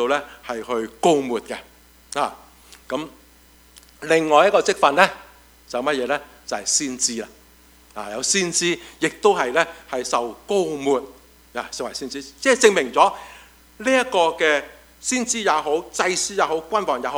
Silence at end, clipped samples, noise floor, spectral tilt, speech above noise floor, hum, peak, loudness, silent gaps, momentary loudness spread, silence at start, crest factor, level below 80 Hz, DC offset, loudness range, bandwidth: 0 s; under 0.1%; -51 dBFS; -2 dB/octave; 31 dB; none; 0 dBFS; -21 LUFS; none; 16 LU; 0 s; 22 dB; -56 dBFS; under 0.1%; 5 LU; over 20 kHz